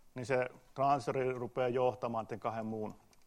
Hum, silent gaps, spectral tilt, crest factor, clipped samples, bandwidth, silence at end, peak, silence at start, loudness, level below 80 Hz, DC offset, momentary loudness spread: none; none; -6.5 dB/octave; 18 dB; under 0.1%; 13.5 kHz; 0.3 s; -18 dBFS; 0.15 s; -36 LUFS; -68 dBFS; under 0.1%; 9 LU